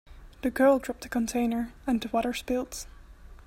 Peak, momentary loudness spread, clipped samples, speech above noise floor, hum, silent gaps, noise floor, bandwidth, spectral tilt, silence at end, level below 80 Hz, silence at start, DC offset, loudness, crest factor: -12 dBFS; 12 LU; under 0.1%; 21 dB; none; none; -48 dBFS; 16 kHz; -4.5 dB/octave; 0.15 s; -50 dBFS; 0.1 s; under 0.1%; -28 LUFS; 18 dB